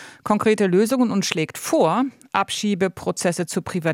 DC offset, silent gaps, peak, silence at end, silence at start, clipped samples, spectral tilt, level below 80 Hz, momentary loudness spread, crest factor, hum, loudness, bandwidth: under 0.1%; none; -2 dBFS; 0 s; 0 s; under 0.1%; -5 dB/octave; -62 dBFS; 6 LU; 20 dB; none; -21 LUFS; 17 kHz